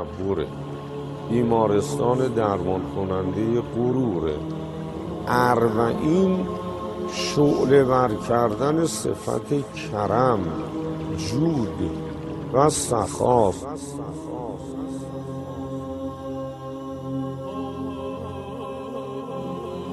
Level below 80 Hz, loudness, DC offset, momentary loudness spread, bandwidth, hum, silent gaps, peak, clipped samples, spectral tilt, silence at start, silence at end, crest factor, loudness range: -48 dBFS; -24 LUFS; under 0.1%; 13 LU; 12.5 kHz; none; none; -4 dBFS; under 0.1%; -6 dB/octave; 0 s; 0 s; 20 dB; 10 LU